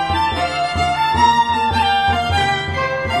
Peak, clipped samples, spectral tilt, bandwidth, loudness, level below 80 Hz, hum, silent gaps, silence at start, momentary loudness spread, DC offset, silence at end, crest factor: -2 dBFS; under 0.1%; -4.5 dB/octave; 13 kHz; -16 LUFS; -34 dBFS; none; none; 0 s; 6 LU; under 0.1%; 0 s; 14 dB